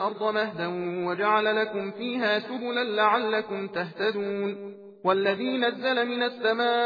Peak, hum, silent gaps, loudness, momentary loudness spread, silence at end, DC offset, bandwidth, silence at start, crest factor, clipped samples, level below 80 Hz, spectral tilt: -8 dBFS; none; none; -26 LUFS; 8 LU; 0 s; under 0.1%; 5 kHz; 0 s; 18 dB; under 0.1%; -84 dBFS; -6.5 dB/octave